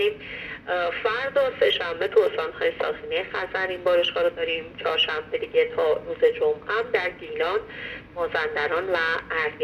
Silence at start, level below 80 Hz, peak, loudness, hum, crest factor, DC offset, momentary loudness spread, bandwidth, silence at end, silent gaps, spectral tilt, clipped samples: 0 s; -56 dBFS; -8 dBFS; -24 LUFS; none; 18 dB; under 0.1%; 7 LU; 12 kHz; 0 s; none; -4.5 dB/octave; under 0.1%